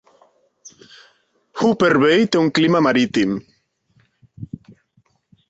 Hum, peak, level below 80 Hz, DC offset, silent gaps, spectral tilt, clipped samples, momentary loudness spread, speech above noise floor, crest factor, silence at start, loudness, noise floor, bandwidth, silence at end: none; -4 dBFS; -58 dBFS; under 0.1%; none; -5.5 dB/octave; under 0.1%; 22 LU; 46 dB; 16 dB; 1.55 s; -17 LUFS; -62 dBFS; 8 kHz; 1.05 s